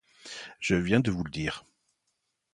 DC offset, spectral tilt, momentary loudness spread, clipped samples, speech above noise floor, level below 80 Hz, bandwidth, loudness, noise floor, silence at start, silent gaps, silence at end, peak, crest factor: under 0.1%; -5.5 dB/octave; 17 LU; under 0.1%; 52 dB; -52 dBFS; 11 kHz; -29 LUFS; -79 dBFS; 0.25 s; none; 0.95 s; -8 dBFS; 24 dB